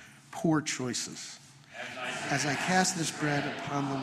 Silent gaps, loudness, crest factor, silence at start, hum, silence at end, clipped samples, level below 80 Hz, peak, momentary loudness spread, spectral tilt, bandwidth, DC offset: none; -31 LUFS; 22 dB; 0 s; none; 0 s; under 0.1%; -68 dBFS; -10 dBFS; 16 LU; -3.5 dB/octave; 14 kHz; under 0.1%